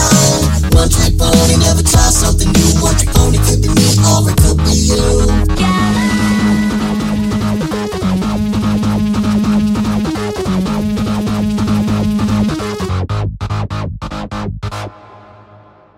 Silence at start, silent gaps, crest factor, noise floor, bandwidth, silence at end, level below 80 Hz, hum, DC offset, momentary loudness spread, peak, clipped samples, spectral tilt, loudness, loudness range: 0 s; none; 12 dB; -42 dBFS; 16.5 kHz; 0.8 s; -18 dBFS; none; under 0.1%; 10 LU; 0 dBFS; under 0.1%; -5 dB/octave; -13 LUFS; 7 LU